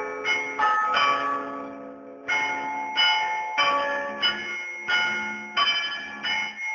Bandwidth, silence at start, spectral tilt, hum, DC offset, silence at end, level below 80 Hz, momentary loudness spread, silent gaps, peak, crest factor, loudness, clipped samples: 7.2 kHz; 0 s; -1 dB/octave; none; under 0.1%; 0 s; -68 dBFS; 9 LU; none; -10 dBFS; 16 dB; -24 LUFS; under 0.1%